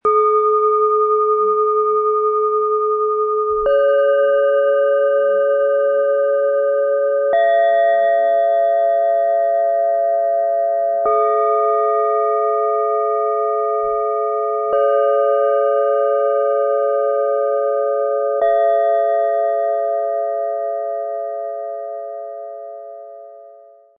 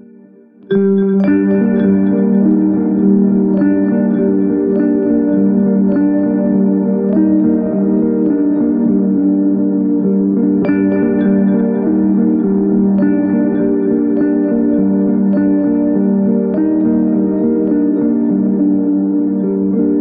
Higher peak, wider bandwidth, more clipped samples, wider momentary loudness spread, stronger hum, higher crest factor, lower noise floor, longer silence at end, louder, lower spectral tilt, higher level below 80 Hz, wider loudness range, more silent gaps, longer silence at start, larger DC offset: second, -6 dBFS vs -2 dBFS; about the same, 3.7 kHz vs 3.6 kHz; neither; first, 8 LU vs 2 LU; neither; about the same, 10 dB vs 10 dB; about the same, -44 dBFS vs -41 dBFS; first, 0.45 s vs 0 s; second, -16 LUFS vs -13 LUFS; second, -6.5 dB/octave vs -11 dB/octave; second, -58 dBFS vs -48 dBFS; first, 4 LU vs 1 LU; neither; second, 0.05 s vs 0.7 s; neither